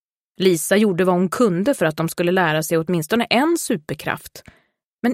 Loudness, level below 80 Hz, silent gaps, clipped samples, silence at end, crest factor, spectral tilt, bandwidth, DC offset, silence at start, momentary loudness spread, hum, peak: -19 LUFS; -58 dBFS; 4.84-4.99 s; under 0.1%; 0 s; 16 dB; -5 dB/octave; 16.5 kHz; under 0.1%; 0.4 s; 9 LU; none; -4 dBFS